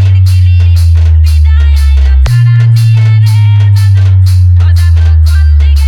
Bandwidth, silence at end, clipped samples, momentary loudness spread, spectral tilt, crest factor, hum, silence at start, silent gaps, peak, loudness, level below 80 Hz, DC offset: 12.5 kHz; 0 s; under 0.1%; 1 LU; -6.5 dB/octave; 4 dB; none; 0 s; none; 0 dBFS; -6 LUFS; -8 dBFS; under 0.1%